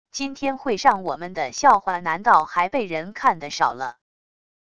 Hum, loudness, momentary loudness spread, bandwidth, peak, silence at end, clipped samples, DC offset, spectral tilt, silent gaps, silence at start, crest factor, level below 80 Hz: none; -21 LUFS; 11 LU; 11 kHz; -2 dBFS; 0.75 s; under 0.1%; 0.5%; -3.5 dB/octave; none; 0.15 s; 20 dB; -58 dBFS